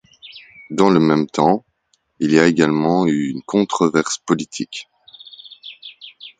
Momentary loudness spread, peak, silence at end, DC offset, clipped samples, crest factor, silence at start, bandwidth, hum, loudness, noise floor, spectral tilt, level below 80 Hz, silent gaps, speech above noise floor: 23 LU; 0 dBFS; 0.1 s; under 0.1%; under 0.1%; 18 dB; 0.25 s; 9.4 kHz; none; -17 LUFS; -65 dBFS; -5.5 dB/octave; -58 dBFS; none; 49 dB